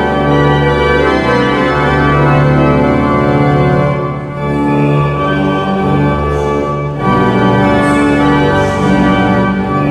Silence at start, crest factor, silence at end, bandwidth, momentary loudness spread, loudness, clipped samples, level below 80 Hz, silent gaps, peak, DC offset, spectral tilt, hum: 0 s; 10 dB; 0 s; 10.5 kHz; 4 LU; -11 LUFS; under 0.1%; -26 dBFS; none; 0 dBFS; under 0.1%; -7.5 dB/octave; none